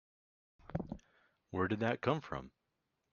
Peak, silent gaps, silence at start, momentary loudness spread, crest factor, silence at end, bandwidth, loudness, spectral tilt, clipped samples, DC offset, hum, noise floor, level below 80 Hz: -18 dBFS; none; 0.7 s; 15 LU; 22 dB; 0.65 s; 7 kHz; -39 LUFS; -5.5 dB/octave; under 0.1%; under 0.1%; none; -85 dBFS; -64 dBFS